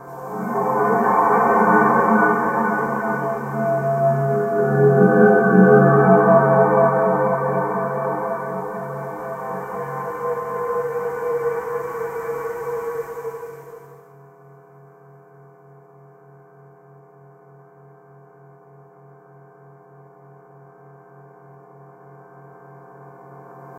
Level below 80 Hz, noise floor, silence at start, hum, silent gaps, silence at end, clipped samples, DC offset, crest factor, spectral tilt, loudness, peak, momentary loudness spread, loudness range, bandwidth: -64 dBFS; -48 dBFS; 0 s; none; none; 0 s; under 0.1%; under 0.1%; 20 dB; -9.5 dB/octave; -18 LUFS; 0 dBFS; 16 LU; 16 LU; 16 kHz